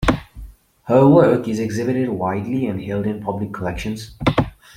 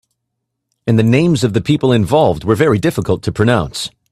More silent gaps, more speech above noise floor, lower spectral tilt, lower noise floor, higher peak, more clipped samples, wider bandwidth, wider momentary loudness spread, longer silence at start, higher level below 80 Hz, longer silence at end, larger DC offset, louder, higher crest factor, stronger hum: neither; second, 21 dB vs 61 dB; about the same, -7.5 dB/octave vs -6.5 dB/octave; second, -39 dBFS vs -74 dBFS; about the same, -2 dBFS vs 0 dBFS; neither; first, 15.5 kHz vs 14 kHz; first, 13 LU vs 6 LU; second, 0 s vs 0.85 s; about the same, -38 dBFS vs -42 dBFS; about the same, 0.25 s vs 0.25 s; neither; second, -19 LUFS vs -14 LUFS; about the same, 18 dB vs 14 dB; neither